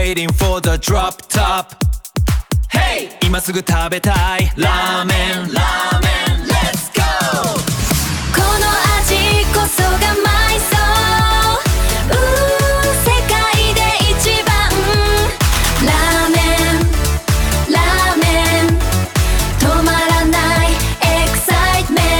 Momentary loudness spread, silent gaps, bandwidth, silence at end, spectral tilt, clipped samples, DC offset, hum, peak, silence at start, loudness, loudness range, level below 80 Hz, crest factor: 4 LU; none; 19.5 kHz; 0 s; -4 dB/octave; under 0.1%; 0.5%; none; 0 dBFS; 0 s; -14 LUFS; 3 LU; -20 dBFS; 14 dB